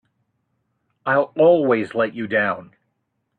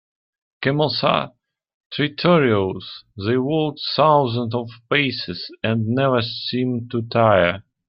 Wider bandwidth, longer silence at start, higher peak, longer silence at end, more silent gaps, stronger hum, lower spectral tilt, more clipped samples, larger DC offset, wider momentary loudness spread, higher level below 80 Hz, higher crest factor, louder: second, 4.5 kHz vs 5.8 kHz; first, 1.05 s vs 0.6 s; about the same, -4 dBFS vs -2 dBFS; first, 0.75 s vs 0.25 s; second, none vs 1.74-1.90 s; neither; second, -8 dB/octave vs -9.5 dB/octave; neither; neither; about the same, 10 LU vs 11 LU; second, -68 dBFS vs -58 dBFS; about the same, 16 dB vs 18 dB; about the same, -19 LUFS vs -20 LUFS